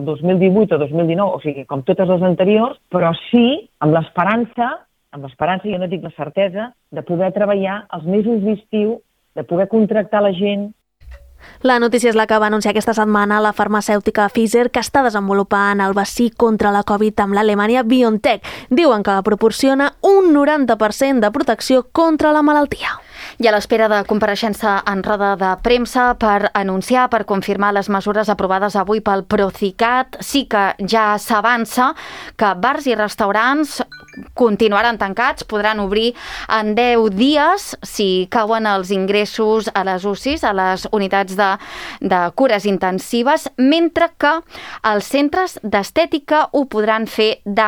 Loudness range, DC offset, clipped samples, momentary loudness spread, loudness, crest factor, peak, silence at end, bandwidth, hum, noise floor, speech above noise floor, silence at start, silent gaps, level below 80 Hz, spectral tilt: 4 LU; under 0.1%; under 0.1%; 7 LU; -16 LUFS; 14 dB; -2 dBFS; 0 s; 19.5 kHz; none; -40 dBFS; 24 dB; 0 s; none; -46 dBFS; -5 dB/octave